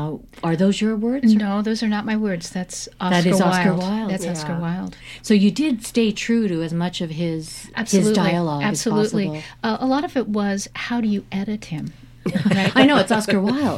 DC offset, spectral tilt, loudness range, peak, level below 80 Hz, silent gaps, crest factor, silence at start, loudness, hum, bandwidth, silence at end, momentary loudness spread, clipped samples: under 0.1%; -5.5 dB/octave; 3 LU; -2 dBFS; -50 dBFS; none; 18 dB; 0 s; -20 LUFS; none; 13.5 kHz; 0 s; 11 LU; under 0.1%